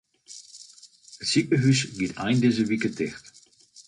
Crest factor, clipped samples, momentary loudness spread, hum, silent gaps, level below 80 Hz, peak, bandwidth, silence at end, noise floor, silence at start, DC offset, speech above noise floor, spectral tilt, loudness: 18 dB; under 0.1%; 23 LU; none; none; -60 dBFS; -10 dBFS; 11 kHz; 0.05 s; -54 dBFS; 0.3 s; under 0.1%; 30 dB; -5 dB/octave; -24 LUFS